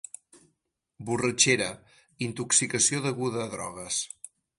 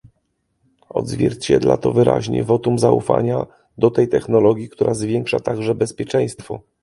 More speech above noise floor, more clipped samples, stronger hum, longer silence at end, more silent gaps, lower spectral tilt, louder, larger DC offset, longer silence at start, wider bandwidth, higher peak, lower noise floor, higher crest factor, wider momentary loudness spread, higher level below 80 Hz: about the same, 52 dB vs 52 dB; neither; neither; about the same, 0.3 s vs 0.25 s; neither; second, -2.5 dB/octave vs -6.5 dB/octave; second, -26 LUFS vs -18 LUFS; neither; second, 0.35 s vs 0.95 s; about the same, 11.5 kHz vs 11.5 kHz; second, -6 dBFS vs 0 dBFS; first, -79 dBFS vs -69 dBFS; first, 24 dB vs 18 dB; first, 21 LU vs 9 LU; second, -64 dBFS vs -48 dBFS